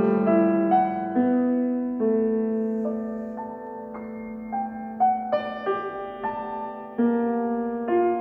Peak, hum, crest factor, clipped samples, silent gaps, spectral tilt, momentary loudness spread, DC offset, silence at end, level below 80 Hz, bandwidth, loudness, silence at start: -8 dBFS; none; 16 dB; under 0.1%; none; -10 dB/octave; 14 LU; under 0.1%; 0 s; -62 dBFS; 4.5 kHz; -25 LUFS; 0 s